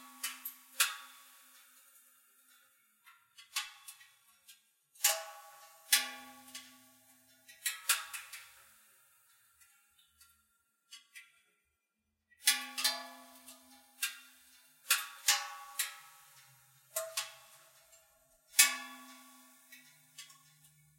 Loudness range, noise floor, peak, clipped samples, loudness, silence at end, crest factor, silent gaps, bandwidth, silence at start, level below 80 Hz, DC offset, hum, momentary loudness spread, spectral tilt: 9 LU; -84 dBFS; -8 dBFS; under 0.1%; -33 LUFS; 0.75 s; 34 dB; none; 16.5 kHz; 0 s; under -90 dBFS; under 0.1%; none; 26 LU; 3 dB/octave